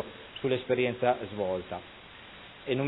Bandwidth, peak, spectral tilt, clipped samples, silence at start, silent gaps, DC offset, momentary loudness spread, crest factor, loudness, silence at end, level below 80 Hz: 4.1 kHz; -12 dBFS; -9.5 dB/octave; under 0.1%; 0 s; none; under 0.1%; 20 LU; 20 dB; -31 LUFS; 0 s; -62 dBFS